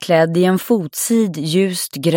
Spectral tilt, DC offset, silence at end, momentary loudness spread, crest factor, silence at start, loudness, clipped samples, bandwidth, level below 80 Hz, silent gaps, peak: -5 dB/octave; under 0.1%; 0 s; 4 LU; 12 dB; 0 s; -16 LUFS; under 0.1%; 17 kHz; -64 dBFS; none; -2 dBFS